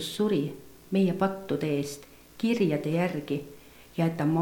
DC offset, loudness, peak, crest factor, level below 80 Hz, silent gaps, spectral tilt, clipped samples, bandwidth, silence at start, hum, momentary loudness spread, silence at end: under 0.1%; -29 LUFS; -12 dBFS; 16 dB; -62 dBFS; none; -6.5 dB/octave; under 0.1%; 19 kHz; 0 s; none; 12 LU; 0 s